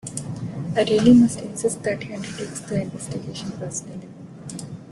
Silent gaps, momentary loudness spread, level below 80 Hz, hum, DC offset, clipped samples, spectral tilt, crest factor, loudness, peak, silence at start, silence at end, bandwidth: none; 21 LU; -54 dBFS; none; under 0.1%; under 0.1%; -5.5 dB/octave; 18 dB; -22 LUFS; -4 dBFS; 0.05 s; 0 s; 12 kHz